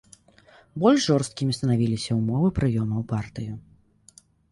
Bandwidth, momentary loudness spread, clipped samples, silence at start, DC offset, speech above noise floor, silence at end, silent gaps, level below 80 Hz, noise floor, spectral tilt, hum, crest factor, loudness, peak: 11.5 kHz; 15 LU; under 0.1%; 0.75 s; under 0.1%; 33 dB; 0.9 s; none; -48 dBFS; -56 dBFS; -6.5 dB/octave; none; 20 dB; -24 LUFS; -6 dBFS